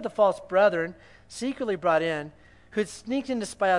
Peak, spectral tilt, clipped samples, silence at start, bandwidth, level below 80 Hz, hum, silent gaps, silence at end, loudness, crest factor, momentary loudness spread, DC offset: -8 dBFS; -5 dB/octave; under 0.1%; 0 s; 11.5 kHz; -62 dBFS; 60 Hz at -60 dBFS; none; 0 s; -27 LUFS; 18 dB; 11 LU; under 0.1%